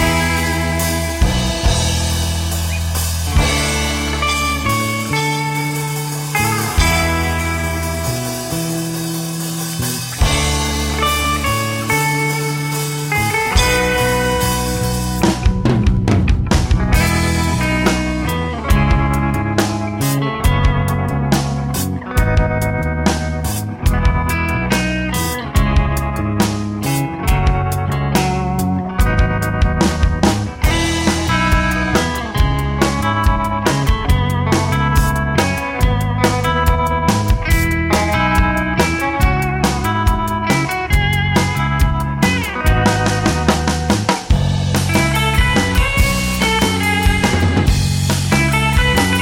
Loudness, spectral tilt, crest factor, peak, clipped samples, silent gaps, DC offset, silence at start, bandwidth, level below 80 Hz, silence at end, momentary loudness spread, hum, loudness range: -16 LUFS; -4.5 dB/octave; 14 dB; -2 dBFS; under 0.1%; none; under 0.1%; 0 s; 17 kHz; -22 dBFS; 0 s; 5 LU; none; 3 LU